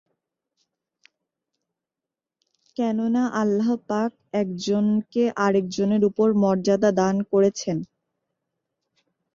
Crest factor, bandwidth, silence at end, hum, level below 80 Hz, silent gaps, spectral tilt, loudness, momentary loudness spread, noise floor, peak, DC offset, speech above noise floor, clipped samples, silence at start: 16 dB; 7.6 kHz; 1.5 s; none; -66 dBFS; none; -6.5 dB/octave; -22 LUFS; 8 LU; -88 dBFS; -8 dBFS; under 0.1%; 67 dB; under 0.1%; 2.8 s